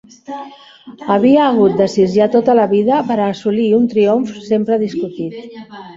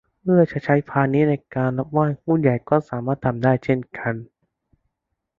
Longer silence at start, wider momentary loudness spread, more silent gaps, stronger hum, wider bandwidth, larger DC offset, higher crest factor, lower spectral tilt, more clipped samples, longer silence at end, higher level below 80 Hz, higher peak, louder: about the same, 0.3 s vs 0.25 s; first, 18 LU vs 8 LU; neither; neither; first, 7.8 kHz vs 7 kHz; neither; about the same, 14 dB vs 18 dB; second, -7 dB/octave vs -10.5 dB/octave; neither; second, 0 s vs 1.15 s; about the same, -56 dBFS vs -56 dBFS; about the same, -2 dBFS vs -2 dBFS; first, -14 LUFS vs -21 LUFS